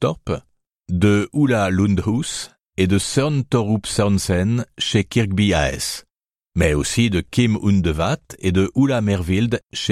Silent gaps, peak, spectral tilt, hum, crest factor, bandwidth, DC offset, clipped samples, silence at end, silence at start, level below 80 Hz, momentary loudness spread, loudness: none; -2 dBFS; -5.5 dB/octave; none; 16 dB; 14.5 kHz; under 0.1%; under 0.1%; 0 s; 0 s; -36 dBFS; 8 LU; -19 LUFS